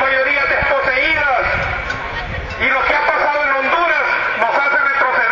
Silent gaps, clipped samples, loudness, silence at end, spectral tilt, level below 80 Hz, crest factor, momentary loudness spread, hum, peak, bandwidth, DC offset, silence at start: none; under 0.1%; -15 LUFS; 0 s; -4.5 dB/octave; -36 dBFS; 14 dB; 8 LU; none; -2 dBFS; 7.6 kHz; under 0.1%; 0 s